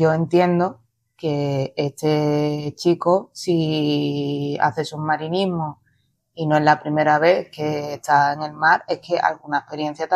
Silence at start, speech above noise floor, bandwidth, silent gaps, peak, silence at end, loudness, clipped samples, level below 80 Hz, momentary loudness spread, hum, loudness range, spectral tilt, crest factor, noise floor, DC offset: 0 s; 45 dB; 13.5 kHz; none; -2 dBFS; 0 s; -21 LUFS; under 0.1%; -62 dBFS; 8 LU; none; 3 LU; -6.5 dB/octave; 18 dB; -65 dBFS; under 0.1%